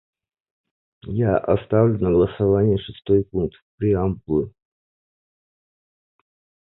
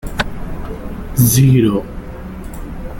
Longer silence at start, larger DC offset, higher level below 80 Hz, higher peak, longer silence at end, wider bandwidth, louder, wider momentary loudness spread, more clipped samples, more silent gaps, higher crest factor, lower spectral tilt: first, 1.05 s vs 0.05 s; neither; second, -42 dBFS vs -28 dBFS; second, -4 dBFS vs 0 dBFS; first, 2.25 s vs 0 s; second, 4.1 kHz vs 17 kHz; second, -21 LUFS vs -14 LUFS; second, 8 LU vs 20 LU; neither; first, 3.62-3.78 s vs none; about the same, 20 dB vs 16 dB; first, -13 dB/octave vs -5.5 dB/octave